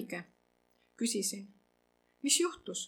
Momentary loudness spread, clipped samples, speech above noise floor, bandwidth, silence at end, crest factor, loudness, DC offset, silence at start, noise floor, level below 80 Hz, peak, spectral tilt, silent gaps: 15 LU; under 0.1%; 39 dB; 18 kHz; 0 s; 24 dB; -33 LUFS; under 0.1%; 0 s; -74 dBFS; -80 dBFS; -14 dBFS; -1.5 dB/octave; none